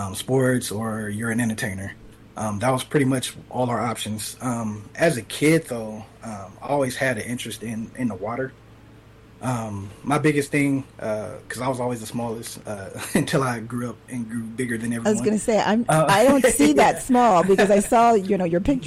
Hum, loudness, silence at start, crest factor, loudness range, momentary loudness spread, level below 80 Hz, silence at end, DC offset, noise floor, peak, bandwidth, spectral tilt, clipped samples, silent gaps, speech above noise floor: none; -22 LUFS; 0 s; 14 dB; 10 LU; 16 LU; -50 dBFS; 0 s; under 0.1%; -48 dBFS; -8 dBFS; 16 kHz; -5 dB/octave; under 0.1%; none; 26 dB